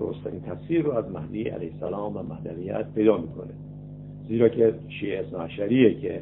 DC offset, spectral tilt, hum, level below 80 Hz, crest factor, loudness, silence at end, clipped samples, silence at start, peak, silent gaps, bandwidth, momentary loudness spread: under 0.1%; -11.5 dB/octave; 50 Hz at -45 dBFS; -52 dBFS; 20 dB; -26 LUFS; 0 s; under 0.1%; 0 s; -6 dBFS; none; 4 kHz; 18 LU